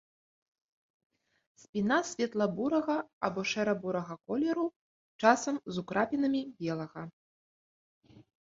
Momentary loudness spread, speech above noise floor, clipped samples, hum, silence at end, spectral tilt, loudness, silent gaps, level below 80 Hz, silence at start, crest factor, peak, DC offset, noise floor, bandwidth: 9 LU; over 59 dB; under 0.1%; none; 0.25 s; -5 dB/octave; -32 LUFS; 3.13-3.21 s, 4.76-5.19 s, 7.13-8.01 s; -72 dBFS; 1.75 s; 26 dB; -8 dBFS; under 0.1%; under -90 dBFS; 8 kHz